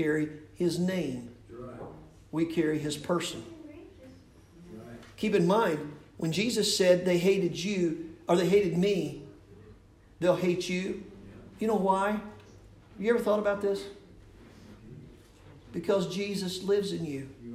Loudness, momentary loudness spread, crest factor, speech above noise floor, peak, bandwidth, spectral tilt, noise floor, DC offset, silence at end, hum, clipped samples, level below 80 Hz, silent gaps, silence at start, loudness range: -29 LUFS; 22 LU; 20 dB; 27 dB; -10 dBFS; 16 kHz; -5.5 dB/octave; -55 dBFS; under 0.1%; 0 s; none; under 0.1%; -60 dBFS; none; 0 s; 7 LU